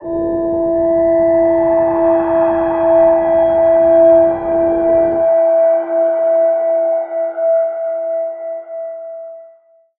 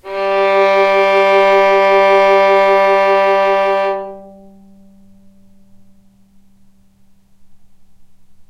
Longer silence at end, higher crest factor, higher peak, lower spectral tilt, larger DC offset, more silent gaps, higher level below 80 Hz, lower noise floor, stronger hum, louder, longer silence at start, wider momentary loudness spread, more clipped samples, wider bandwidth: first, 0.55 s vs 0.05 s; about the same, 12 dB vs 12 dB; about the same, -2 dBFS vs -2 dBFS; first, -11 dB/octave vs -4.5 dB/octave; neither; neither; first, -44 dBFS vs -54 dBFS; about the same, -47 dBFS vs -47 dBFS; neither; about the same, -13 LUFS vs -11 LUFS; about the same, 0 s vs 0.05 s; first, 14 LU vs 7 LU; neither; second, 3.5 kHz vs 9.4 kHz